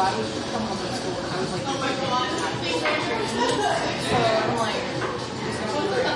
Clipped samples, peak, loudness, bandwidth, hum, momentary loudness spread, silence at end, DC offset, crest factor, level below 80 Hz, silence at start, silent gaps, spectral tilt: under 0.1%; -10 dBFS; -25 LUFS; 11.5 kHz; none; 6 LU; 0 s; under 0.1%; 16 dB; -52 dBFS; 0 s; none; -4 dB/octave